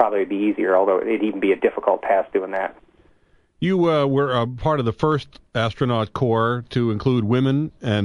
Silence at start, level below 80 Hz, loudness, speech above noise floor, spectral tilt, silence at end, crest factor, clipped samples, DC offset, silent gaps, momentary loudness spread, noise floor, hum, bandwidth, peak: 0 s; -50 dBFS; -21 LUFS; 38 dB; -8 dB/octave; 0 s; 18 dB; under 0.1%; under 0.1%; none; 6 LU; -58 dBFS; none; 10.5 kHz; -2 dBFS